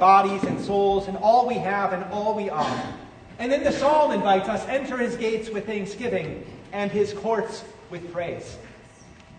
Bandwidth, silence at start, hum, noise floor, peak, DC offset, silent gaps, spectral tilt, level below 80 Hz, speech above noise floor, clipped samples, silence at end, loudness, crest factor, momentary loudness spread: 9.6 kHz; 0 s; none; -48 dBFS; -4 dBFS; under 0.1%; none; -5.5 dB/octave; -54 dBFS; 25 dB; under 0.1%; 0 s; -24 LUFS; 20 dB; 17 LU